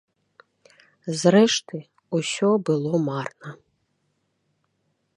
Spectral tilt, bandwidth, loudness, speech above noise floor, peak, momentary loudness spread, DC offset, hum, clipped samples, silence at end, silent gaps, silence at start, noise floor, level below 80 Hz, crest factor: -5 dB/octave; 11.5 kHz; -22 LUFS; 51 dB; -4 dBFS; 20 LU; under 0.1%; none; under 0.1%; 1.6 s; none; 1.05 s; -72 dBFS; -70 dBFS; 22 dB